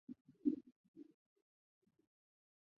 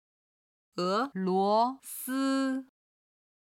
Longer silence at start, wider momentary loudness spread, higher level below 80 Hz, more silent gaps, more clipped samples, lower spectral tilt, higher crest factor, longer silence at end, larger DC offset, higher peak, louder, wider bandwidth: second, 0.1 s vs 0.75 s; first, 23 LU vs 11 LU; second, under -90 dBFS vs -84 dBFS; first, 0.21-0.25 s, 0.72-0.94 s vs none; neither; first, -10.5 dB/octave vs -5 dB/octave; first, 26 dB vs 16 dB; first, 1.75 s vs 0.75 s; neither; second, -24 dBFS vs -16 dBFS; second, -43 LUFS vs -30 LUFS; second, 1.5 kHz vs 17 kHz